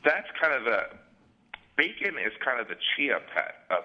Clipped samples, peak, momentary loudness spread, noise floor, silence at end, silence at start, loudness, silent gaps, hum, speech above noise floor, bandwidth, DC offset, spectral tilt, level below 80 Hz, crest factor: under 0.1%; -6 dBFS; 6 LU; -50 dBFS; 0 s; 0.05 s; -28 LUFS; none; none; 22 dB; 7 kHz; under 0.1%; -4.5 dB/octave; -72 dBFS; 22 dB